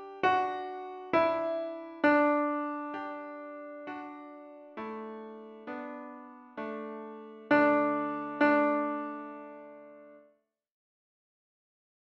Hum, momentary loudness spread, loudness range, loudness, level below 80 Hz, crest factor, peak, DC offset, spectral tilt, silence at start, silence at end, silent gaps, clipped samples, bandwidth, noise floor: none; 21 LU; 13 LU; -30 LUFS; -76 dBFS; 20 dB; -12 dBFS; under 0.1%; -6.5 dB/octave; 0 s; 1.85 s; none; under 0.1%; 6.2 kHz; -69 dBFS